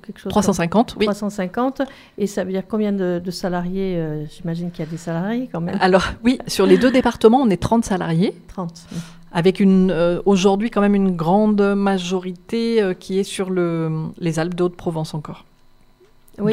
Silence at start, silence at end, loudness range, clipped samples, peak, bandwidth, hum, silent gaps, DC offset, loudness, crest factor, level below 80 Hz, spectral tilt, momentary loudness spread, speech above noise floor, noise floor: 0.1 s; 0 s; 7 LU; under 0.1%; 0 dBFS; 14.5 kHz; none; none; under 0.1%; -19 LUFS; 18 dB; -44 dBFS; -6.5 dB/octave; 13 LU; 32 dB; -51 dBFS